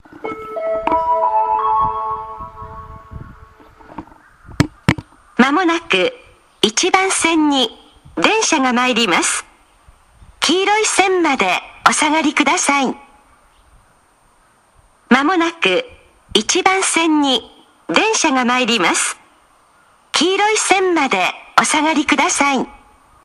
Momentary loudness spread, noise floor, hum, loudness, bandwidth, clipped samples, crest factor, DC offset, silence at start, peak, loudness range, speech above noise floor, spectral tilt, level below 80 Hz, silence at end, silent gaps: 16 LU; -54 dBFS; none; -15 LUFS; 14.5 kHz; under 0.1%; 18 dB; under 0.1%; 0.25 s; 0 dBFS; 5 LU; 39 dB; -2.5 dB/octave; -48 dBFS; 0.5 s; none